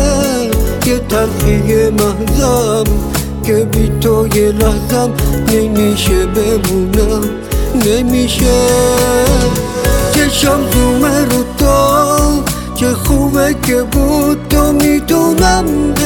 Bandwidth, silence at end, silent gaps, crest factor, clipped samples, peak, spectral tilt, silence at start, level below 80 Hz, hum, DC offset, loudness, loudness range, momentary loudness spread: 19.5 kHz; 0 s; none; 10 dB; under 0.1%; 0 dBFS; -5 dB/octave; 0 s; -18 dBFS; none; under 0.1%; -12 LUFS; 2 LU; 4 LU